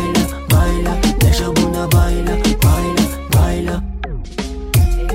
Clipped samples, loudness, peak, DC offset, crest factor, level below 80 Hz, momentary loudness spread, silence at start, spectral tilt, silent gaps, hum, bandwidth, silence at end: under 0.1%; -16 LUFS; -2 dBFS; under 0.1%; 14 dB; -20 dBFS; 11 LU; 0 s; -5.5 dB/octave; none; none; 16.5 kHz; 0 s